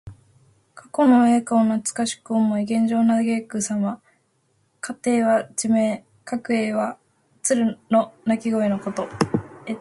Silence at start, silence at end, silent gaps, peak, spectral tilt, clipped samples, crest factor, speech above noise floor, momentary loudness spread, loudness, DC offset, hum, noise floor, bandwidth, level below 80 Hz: 0.05 s; 0 s; none; -4 dBFS; -5 dB/octave; under 0.1%; 18 dB; 45 dB; 11 LU; -22 LUFS; under 0.1%; none; -66 dBFS; 11.5 kHz; -60 dBFS